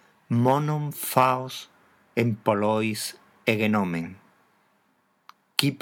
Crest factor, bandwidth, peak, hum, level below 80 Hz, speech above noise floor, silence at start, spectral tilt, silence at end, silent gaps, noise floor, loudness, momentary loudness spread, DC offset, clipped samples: 26 dB; 19.5 kHz; 0 dBFS; none; -72 dBFS; 44 dB; 0.3 s; -5.5 dB/octave; 0.05 s; none; -68 dBFS; -25 LUFS; 11 LU; under 0.1%; under 0.1%